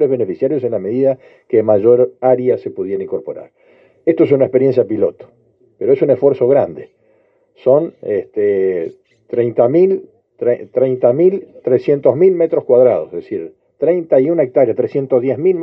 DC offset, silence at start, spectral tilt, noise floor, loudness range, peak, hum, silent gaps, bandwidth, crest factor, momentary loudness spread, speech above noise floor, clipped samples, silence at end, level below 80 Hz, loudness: under 0.1%; 0 s; -11 dB/octave; -56 dBFS; 3 LU; 0 dBFS; none; none; 5.4 kHz; 14 dB; 11 LU; 42 dB; under 0.1%; 0 s; -66 dBFS; -15 LUFS